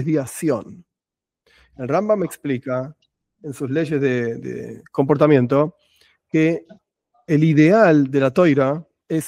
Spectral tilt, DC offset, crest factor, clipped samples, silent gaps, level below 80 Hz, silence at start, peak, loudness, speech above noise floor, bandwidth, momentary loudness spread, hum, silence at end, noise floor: -7.5 dB/octave; under 0.1%; 18 dB; under 0.1%; none; -62 dBFS; 0 s; 0 dBFS; -19 LUFS; 70 dB; 16 kHz; 16 LU; none; 0 s; -88 dBFS